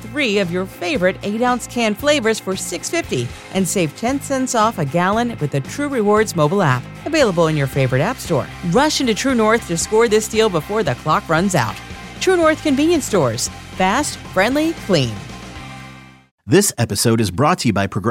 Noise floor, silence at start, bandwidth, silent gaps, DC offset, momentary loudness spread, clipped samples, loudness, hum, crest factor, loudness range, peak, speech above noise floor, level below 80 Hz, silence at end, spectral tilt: -39 dBFS; 0 s; 17 kHz; 16.31-16.38 s; under 0.1%; 8 LU; under 0.1%; -17 LUFS; none; 16 dB; 3 LU; -2 dBFS; 22 dB; -44 dBFS; 0 s; -4.5 dB/octave